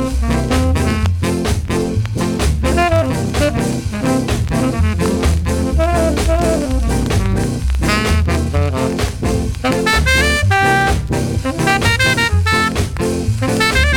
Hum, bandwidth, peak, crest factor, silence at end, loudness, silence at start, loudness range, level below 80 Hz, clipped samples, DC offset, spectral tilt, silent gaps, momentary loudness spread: none; 18 kHz; -2 dBFS; 12 dB; 0 s; -16 LUFS; 0 s; 3 LU; -22 dBFS; under 0.1%; under 0.1%; -5 dB/octave; none; 6 LU